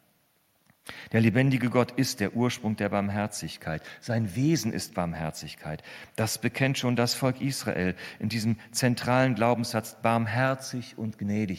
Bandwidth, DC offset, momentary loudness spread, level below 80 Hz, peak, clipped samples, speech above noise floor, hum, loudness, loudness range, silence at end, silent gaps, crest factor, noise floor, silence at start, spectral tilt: 16 kHz; under 0.1%; 12 LU; -62 dBFS; -8 dBFS; under 0.1%; 41 dB; none; -28 LUFS; 3 LU; 0 s; none; 20 dB; -68 dBFS; 0.85 s; -5.5 dB/octave